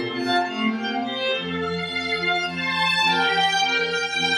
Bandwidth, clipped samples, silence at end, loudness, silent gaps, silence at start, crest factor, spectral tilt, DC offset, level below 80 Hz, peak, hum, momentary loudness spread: 13.5 kHz; under 0.1%; 0 s; -22 LUFS; none; 0 s; 14 dB; -3 dB/octave; under 0.1%; -60 dBFS; -8 dBFS; none; 7 LU